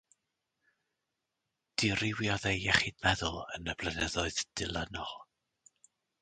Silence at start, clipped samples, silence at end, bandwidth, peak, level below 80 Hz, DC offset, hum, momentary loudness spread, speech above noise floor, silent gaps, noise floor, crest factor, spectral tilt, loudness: 1.8 s; under 0.1%; 1 s; 10 kHz; -10 dBFS; -52 dBFS; under 0.1%; none; 11 LU; 53 dB; none; -86 dBFS; 26 dB; -3.5 dB/octave; -33 LUFS